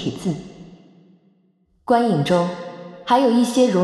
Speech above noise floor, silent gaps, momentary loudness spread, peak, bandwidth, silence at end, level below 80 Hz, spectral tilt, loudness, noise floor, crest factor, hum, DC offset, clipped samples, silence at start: 44 dB; none; 18 LU; -4 dBFS; 13 kHz; 0 s; -58 dBFS; -6 dB/octave; -19 LUFS; -61 dBFS; 16 dB; none; under 0.1%; under 0.1%; 0 s